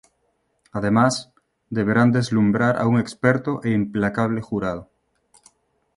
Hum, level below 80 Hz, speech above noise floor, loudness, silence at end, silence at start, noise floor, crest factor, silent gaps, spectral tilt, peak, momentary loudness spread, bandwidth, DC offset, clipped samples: none; -54 dBFS; 49 dB; -21 LUFS; 1.15 s; 0.75 s; -69 dBFS; 20 dB; none; -6.5 dB/octave; -2 dBFS; 10 LU; 11.5 kHz; under 0.1%; under 0.1%